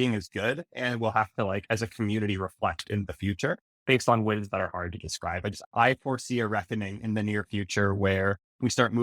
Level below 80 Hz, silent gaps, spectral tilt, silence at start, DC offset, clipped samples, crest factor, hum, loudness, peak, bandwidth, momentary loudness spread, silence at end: -58 dBFS; 3.61-3.86 s, 5.66-5.71 s, 8.44-8.59 s; -5.5 dB/octave; 0 s; under 0.1%; under 0.1%; 22 dB; none; -29 LUFS; -6 dBFS; 15 kHz; 8 LU; 0 s